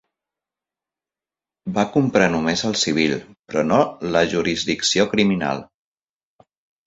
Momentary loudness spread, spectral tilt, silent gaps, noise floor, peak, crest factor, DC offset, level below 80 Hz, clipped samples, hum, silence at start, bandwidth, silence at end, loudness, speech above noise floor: 9 LU; -4 dB/octave; 3.39-3.43 s; under -90 dBFS; -2 dBFS; 20 dB; under 0.1%; -52 dBFS; under 0.1%; none; 1.65 s; 8 kHz; 1.2 s; -20 LUFS; over 70 dB